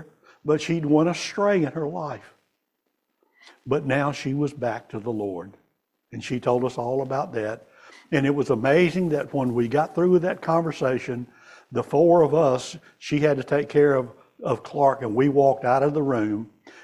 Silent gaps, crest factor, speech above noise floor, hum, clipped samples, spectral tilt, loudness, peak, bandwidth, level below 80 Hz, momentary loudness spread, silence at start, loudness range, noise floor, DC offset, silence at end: none; 18 dB; 54 dB; none; under 0.1%; -7 dB/octave; -23 LUFS; -6 dBFS; 12 kHz; -60 dBFS; 13 LU; 0 s; 7 LU; -77 dBFS; under 0.1%; 0.05 s